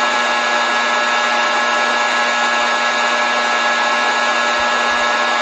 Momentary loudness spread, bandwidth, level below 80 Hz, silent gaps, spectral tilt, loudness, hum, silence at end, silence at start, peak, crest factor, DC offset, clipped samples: 0 LU; 9.6 kHz; -58 dBFS; none; 0 dB/octave; -15 LUFS; none; 0 s; 0 s; -4 dBFS; 12 dB; under 0.1%; under 0.1%